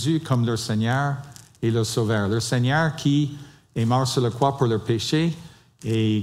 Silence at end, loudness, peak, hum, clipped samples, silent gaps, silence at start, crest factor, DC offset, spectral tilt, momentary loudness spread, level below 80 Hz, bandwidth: 0 s; -23 LUFS; -6 dBFS; none; under 0.1%; none; 0 s; 16 dB; under 0.1%; -6 dB/octave; 9 LU; -58 dBFS; 14.5 kHz